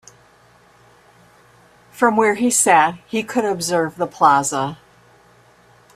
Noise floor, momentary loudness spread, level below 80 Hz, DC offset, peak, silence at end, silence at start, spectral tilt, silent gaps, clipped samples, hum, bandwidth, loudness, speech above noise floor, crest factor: -52 dBFS; 10 LU; -62 dBFS; under 0.1%; 0 dBFS; 1.2 s; 1.95 s; -3 dB/octave; none; under 0.1%; none; 15.5 kHz; -17 LUFS; 35 dB; 20 dB